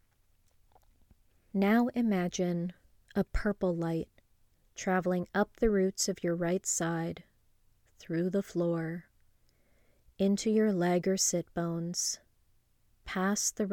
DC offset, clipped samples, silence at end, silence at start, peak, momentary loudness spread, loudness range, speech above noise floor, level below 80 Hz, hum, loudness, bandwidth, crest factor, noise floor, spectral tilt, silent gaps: under 0.1%; under 0.1%; 0 s; 1.55 s; -14 dBFS; 11 LU; 3 LU; 38 dB; -50 dBFS; none; -31 LUFS; 17.5 kHz; 18 dB; -68 dBFS; -4.5 dB/octave; none